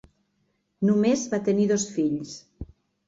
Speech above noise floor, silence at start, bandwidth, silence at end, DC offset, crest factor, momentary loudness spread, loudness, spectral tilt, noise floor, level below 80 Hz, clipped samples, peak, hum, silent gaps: 49 dB; 0.8 s; 7.8 kHz; 0.45 s; under 0.1%; 16 dB; 22 LU; -24 LUFS; -5.5 dB/octave; -72 dBFS; -54 dBFS; under 0.1%; -10 dBFS; none; none